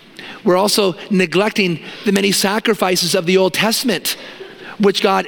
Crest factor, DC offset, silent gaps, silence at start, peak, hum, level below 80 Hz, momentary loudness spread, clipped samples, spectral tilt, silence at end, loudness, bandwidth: 16 dB; under 0.1%; none; 0.2 s; 0 dBFS; none; -60 dBFS; 9 LU; under 0.1%; -3.5 dB/octave; 0 s; -16 LUFS; 17.5 kHz